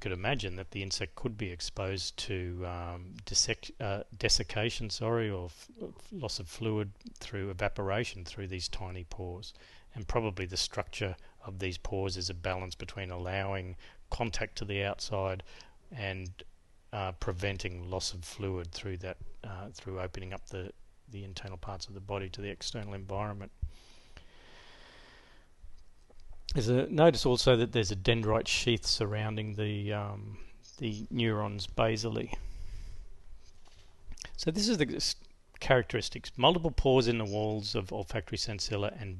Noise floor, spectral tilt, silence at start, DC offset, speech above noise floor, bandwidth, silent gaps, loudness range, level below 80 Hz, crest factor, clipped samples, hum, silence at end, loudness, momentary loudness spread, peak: -57 dBFS; -4.5 dB/octave; 0 s; under 0.1%; 23 dB; 12.5 kHz; none; 12 LU; -46 dBFS; 24 dB; under 0.1%; none; 0 s; -33 LUFS; 17 LU; -10 dBFS